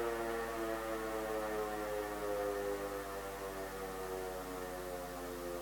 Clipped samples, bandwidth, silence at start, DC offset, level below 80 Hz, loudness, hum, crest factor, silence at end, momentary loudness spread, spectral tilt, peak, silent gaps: under 0.1%; 18 kHz; 0 s; under 0.1%; -56 dBFS; -41 LUFS; none; 14 dB; 0 s; 5 LU; -4 dB/octave; -26 dBFS; none